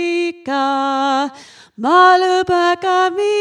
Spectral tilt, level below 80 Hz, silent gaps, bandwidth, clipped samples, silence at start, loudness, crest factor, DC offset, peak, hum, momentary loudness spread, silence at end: -3.5 dB/octave; -58 dBFS; none; 10.5 kHz; under 0.1%; 0 s; -15 LUFS; 14 dB; under 0.1%; 0 dBFS; none; 10 LU; 0 s